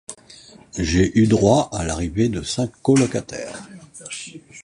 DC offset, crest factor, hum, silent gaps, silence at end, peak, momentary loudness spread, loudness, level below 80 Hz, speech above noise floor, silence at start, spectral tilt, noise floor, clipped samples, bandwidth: under 0.1%; 18 dB; none; none; 0 s; -2 dBFS; 21 LU; -19 LUFS; -38 dBFS; 26 dB; 0.1 s; -5.5 dB/octave; -46 dBFS; under 0.1%; 11 kHz